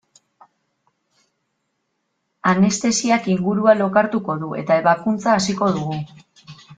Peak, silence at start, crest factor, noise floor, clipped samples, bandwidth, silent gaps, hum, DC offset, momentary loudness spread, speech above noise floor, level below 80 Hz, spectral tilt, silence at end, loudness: -2 dBFS; 2.45 s; 18 dB; -73 dBFS; under 0.1%; 9.4 kHz; none; none; under 0.1%; 9 LU; 55 dB; -60 dBFS; -5 dB/octave; 0.05 s; -18 LUFS